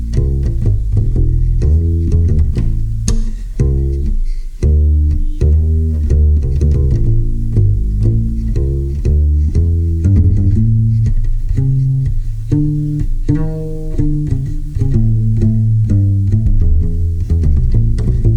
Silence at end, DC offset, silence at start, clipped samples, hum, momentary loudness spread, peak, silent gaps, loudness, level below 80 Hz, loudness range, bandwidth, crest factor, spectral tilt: 0 s; under 0.1%; 0 s; under 0.1%; none; 6 LU; 0 dBFS; none; -15 LUFS; -14 dBFS; 3 LU; 9.4 kHz; 12 dB; -9 dB/octave